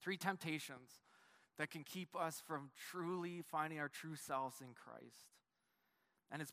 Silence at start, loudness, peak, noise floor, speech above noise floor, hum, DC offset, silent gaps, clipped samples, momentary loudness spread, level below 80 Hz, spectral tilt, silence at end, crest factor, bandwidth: 0 s; -46 LUFS; -24 dBFS; -85 dBFS; 38 dB; none; under 0.1%; none; under 0.1%; 16 LU; under -90 dBFS; -4.5 dB/octave; 0 s; 24 dB; 15.5 kHz